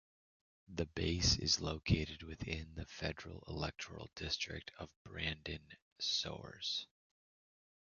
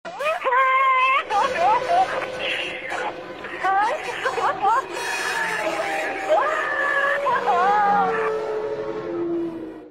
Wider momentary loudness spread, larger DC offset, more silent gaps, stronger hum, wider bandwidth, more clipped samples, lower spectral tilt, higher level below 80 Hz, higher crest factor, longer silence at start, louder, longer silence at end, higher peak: first, 16 LU vs 10 LU; second, under 0.1% vs 0.1%; first, 4.96-5.05 s, 5.82-5.96 s vs none; neither; second, 7.2 kHz vs 16 kHz; neither; about the same, -3.5 dB/octave vs -3 dB/octave; first, -52 dBFS vs -62 dBFS; first, 24 dB vs 14 dB; first, 0.7 s vs 0.05 s; second, -39 LUFS vs -21 LUFS; first, 0.95 s vs 0 s; second, -18 dBFS vs -8 dBFS